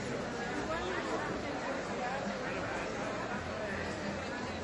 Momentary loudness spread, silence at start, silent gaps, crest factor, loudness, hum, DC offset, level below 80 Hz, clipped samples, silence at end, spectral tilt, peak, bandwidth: 2 LU; 0 s; none; 14 dB; -37 LUFS; none; under 0.1%; -56 dBFS; under 0.1%; 0 s; -4.5 dB/octave; -24 dBFS; 11.5 kHz